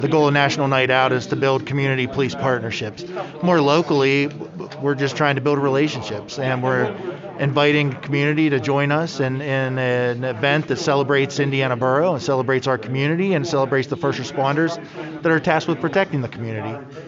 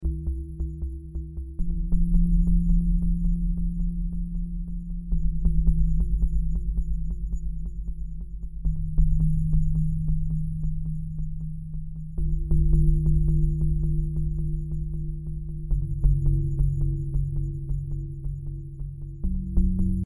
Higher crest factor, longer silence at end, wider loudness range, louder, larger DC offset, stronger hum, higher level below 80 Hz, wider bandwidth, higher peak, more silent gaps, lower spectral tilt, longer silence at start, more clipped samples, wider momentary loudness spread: about the same, 18 dB vs 16 dB; about the same, 0 s vs 0 s; about the same, 1 LU vs 3 LU; first, -20 LUFS vs -29 LUFS; neither; neither; second, -60 dBFS vs -26 dBFS; second, 7.8 kHz vs 11.5 kHz; first, -2 dBFS vs -8 dBFS; neither; second, -4.5 dB/octave vs -12.5 dB/octave; about the same, 0 s vs 0 s; neither; about the same, 10 LU vs 12 LU